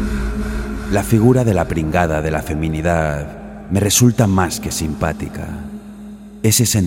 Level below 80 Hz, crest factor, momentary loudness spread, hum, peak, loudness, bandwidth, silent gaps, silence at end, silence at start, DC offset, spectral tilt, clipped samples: -30 dBFS; 16 dB; 17 LU; none; -2 dBFS; -17 LUFS; 17 kHz; none; 0 s; 0 s; under 0.1%; -5 dB/octave; under 0.1%